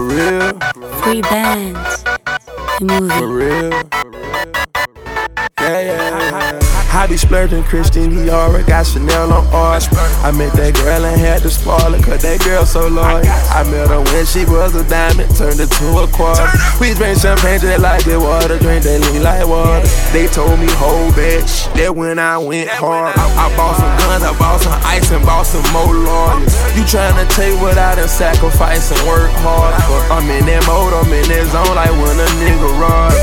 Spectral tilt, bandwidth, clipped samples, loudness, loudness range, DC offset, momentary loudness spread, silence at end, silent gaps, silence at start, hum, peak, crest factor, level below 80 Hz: -5 dB/octave; 18 kHz; under 0.1%; -13 LUFS; 4 LU; under 0.1%; 5 LU; 0 s; none; 0 s; none; 0 dBFS; 10 dB; -12 dBFS